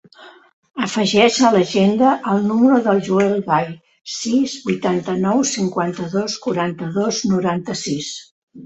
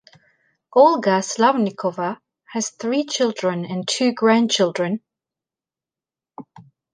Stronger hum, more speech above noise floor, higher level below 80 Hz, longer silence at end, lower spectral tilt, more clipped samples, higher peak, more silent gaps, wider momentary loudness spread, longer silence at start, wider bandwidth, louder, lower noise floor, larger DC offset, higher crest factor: neither; second, 27 dB vs over 71 dB; first, -58 dBFS vs -74 dBFS; second, 0 s vs 0.35 s; about the same, -5 dB/octave vs -4 dB/octave; neither; about the same, -2 dBFS vs -2 dBFS; first, 0.53-0.63 s, 8.31-8.47 s vs none; about the same, 11 LU vs 12 LU; second, 0.2 s vs 0.75 s; second, 8.2 kHz vs 10 kHz; about the same, -18 LUFS vs -20 LUFS; second, -44 dBFS vs under -90 dBFS; neither; about the same, 16 dB vs 20 dB